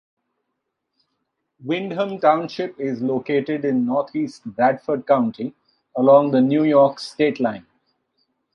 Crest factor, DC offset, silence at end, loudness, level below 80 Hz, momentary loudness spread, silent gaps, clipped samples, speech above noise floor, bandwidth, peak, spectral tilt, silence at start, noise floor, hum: 18 dB; under 0.1%; 0.95 s; -20 LUFS; -70 dBFS; 13 LU; none; under 0.1%; 59 dB; 10.5 kHz; -2 dBFS; -7.5 dB/octave; 1.6 s; -78 dBFS; none